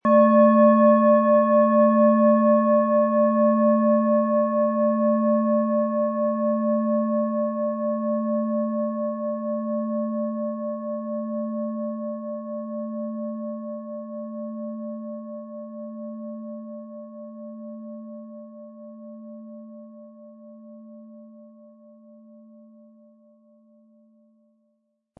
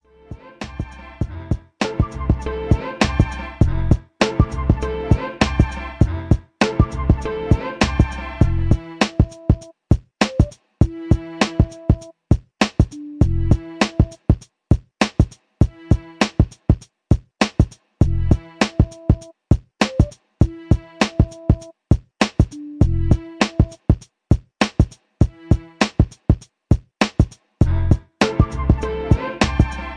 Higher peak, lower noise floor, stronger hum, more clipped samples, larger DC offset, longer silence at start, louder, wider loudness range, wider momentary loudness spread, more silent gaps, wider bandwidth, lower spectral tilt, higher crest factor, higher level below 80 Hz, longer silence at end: second, -6 dBFS vs 0 dBFS; first, -72 dBFS vs -39 dBFS; neither; neither; neither; second, 0.05 s vs 0.3 s; about the same, -22 LUFS vs -20 LUFS; first, 22 LU vs 1 LU; first, 22 LU vs 4 LU; neither; second, 3.6 kHz vs 10.5 kHz; first, -12 dB/octave vs -6.5 dB/octave; about the same, 18 dB vs 18 dB; second, -82 dBFS vs -24 dBFS; first, 3.75 s vs 0 s